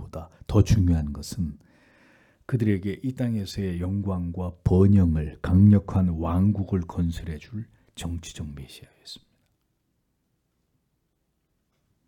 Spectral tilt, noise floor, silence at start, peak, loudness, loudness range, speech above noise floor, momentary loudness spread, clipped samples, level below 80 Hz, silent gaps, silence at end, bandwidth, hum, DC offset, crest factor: -8 dB/octave; -74 dBFS; 0 s; -6 dBFS; -24 LUFS; 18 LU; 50 dB; 21 LU; under 0.1%; -42 dBFS; none; 2.9 s; 13 kHz; none; under 0.1%; 20 dB